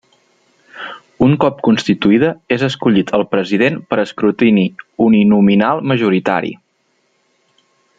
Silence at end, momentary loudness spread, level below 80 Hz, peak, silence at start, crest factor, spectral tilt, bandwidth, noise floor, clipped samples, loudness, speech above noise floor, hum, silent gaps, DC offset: 1.45 s; 9 LU; -52 dBFS; 0 dBFS; 0.75 s; 14 dB; -7 dB/octave; 7.8 kHz; -62 dBFS; under 0.1%; -14 LUFS; 49 dB; none; none; under 0.1%